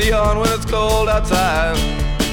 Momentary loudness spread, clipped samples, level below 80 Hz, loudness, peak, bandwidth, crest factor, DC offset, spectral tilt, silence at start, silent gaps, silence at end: 4 LU; under 0.1%; -22 dBFS; -17 LUFS; -2 dBFS; 19 kHz; 14 dB; under 0.1%; -4.5 dB/octave; 0 s; none; 0 s